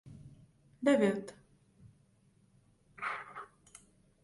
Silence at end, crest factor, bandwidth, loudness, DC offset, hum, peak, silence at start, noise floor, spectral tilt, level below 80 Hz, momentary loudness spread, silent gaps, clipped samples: 0.8 s; 22 dB; 11.5 kHz; -33 LUFS; under 0.1%; none; -16 dBFS; 0.05 s; -68 dBFS; -6 dB/octave; -72 dBFS; 29 LU; none; under 0.1%